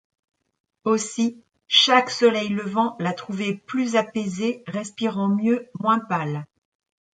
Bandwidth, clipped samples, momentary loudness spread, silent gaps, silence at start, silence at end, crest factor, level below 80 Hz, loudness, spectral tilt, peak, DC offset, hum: 9.4 kHz; under 0.1%; 11 LU; none; 0.85 s; 0.75 s; 22 dB; -70 dBFS; -22 LUFS; -4 dB/octave; -2 dBFS; under 0.1%; none